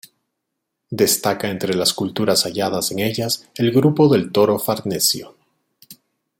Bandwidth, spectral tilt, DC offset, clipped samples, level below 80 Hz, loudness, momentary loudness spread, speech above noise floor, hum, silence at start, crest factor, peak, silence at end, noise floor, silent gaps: 17 kHz; -4 dB/octave; under 0.1%; under 0.1%; -60 dBFS; -18 LUFS; 7 LU; 60 dB; none; 0.9 s; 18 dB; -2 dBFS; 0.45 s; -78 dBFS; none